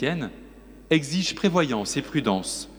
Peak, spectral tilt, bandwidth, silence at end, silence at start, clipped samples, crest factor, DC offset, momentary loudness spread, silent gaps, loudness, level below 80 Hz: -6 dBFS; -4.5 dB/octave; over 20 kHz; 0 s; 0 s; under 0.1%; 18 dB; under 0.1%; 5 LU; none; -25 LUFS; -52 dBFS